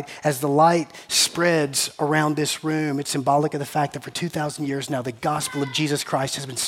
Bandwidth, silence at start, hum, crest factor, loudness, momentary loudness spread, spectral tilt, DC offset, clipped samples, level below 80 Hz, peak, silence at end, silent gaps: 17 kHz; 0 s; none; 18 dB; -22 LUFS; 9 LU; -4 dB/octave; under 0.1%; under 0.1%; -64 dBFS; -4 dBFS; 0 s; none